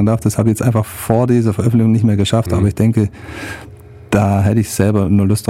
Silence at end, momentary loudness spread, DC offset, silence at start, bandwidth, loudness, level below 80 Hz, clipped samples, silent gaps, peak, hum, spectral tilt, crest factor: 0.05 s; 9 LU; under 0.1%; 0 s; 15.5 kHz; -14 LUFS; -38 dBFS; under 0.1%; none; 0 dBFS; none; -7 dB/octave; 14 dB